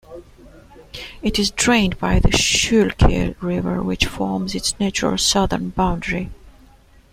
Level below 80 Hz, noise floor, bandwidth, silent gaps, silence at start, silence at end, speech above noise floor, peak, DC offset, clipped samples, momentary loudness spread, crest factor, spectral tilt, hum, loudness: -28 dBFS; -49 dBFS; 16 kHz; none; 0.1 s; 0.6 s; 31 dB; -2 dBFS; under 0.1%; under 0.1%; 10 LU; 18 dB; -4 dB/octave; none; -19 LUFS